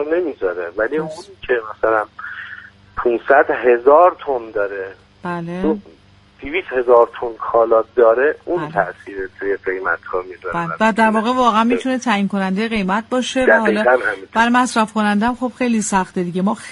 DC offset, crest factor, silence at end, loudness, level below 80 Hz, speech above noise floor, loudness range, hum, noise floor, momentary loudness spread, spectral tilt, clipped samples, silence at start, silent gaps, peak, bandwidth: under 0.1%; 16 dB; 0 s; -17 LUFS; -48 dBFS; 21 dB; 3 LU; none; -38 dBFS; 13 LU; -5 dB/octave; under 0.1%; 0 s; none; 0 dBFS; 11.5 kHz